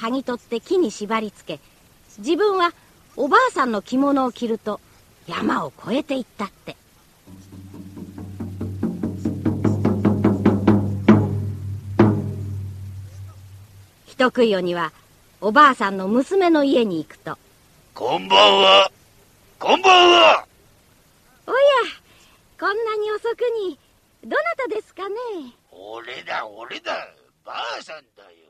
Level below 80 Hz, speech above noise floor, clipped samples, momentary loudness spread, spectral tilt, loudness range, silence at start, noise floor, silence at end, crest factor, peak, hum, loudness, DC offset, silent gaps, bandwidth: -54 dBFS; 36 dB; under 0.1%; 22 LU; -5.5 dB/octave; 13 LU; 0 s; -55 dBFS; 0.5 s; 20 dB; 0 dBFS; none; -19 LUFS; under 0.1%; none; 14 kHz